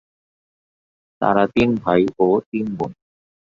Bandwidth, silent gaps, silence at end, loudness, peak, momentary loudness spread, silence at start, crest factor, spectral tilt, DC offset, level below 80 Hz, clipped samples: 7.4 kHz; 2.46-2.52 s; 0.65 s; -19 LUFS; -2 dBFS; 9 LU; 1.2 s; 20 dB; -8 dB/octave; under 0.1%; -48 dBFS; under 0.1%